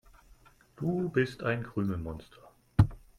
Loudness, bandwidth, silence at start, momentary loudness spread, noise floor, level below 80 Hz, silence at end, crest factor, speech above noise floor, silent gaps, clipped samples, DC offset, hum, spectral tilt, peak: -32 LUFS; 11 kHz; 0.8 s; 10 LU; -60 dBFS; -48 dBFS; 0.2 s; 24 dB; 28 dB; none; under 0.1%; under 0.1%; none; -8.5 dB/octave; -8 dBFS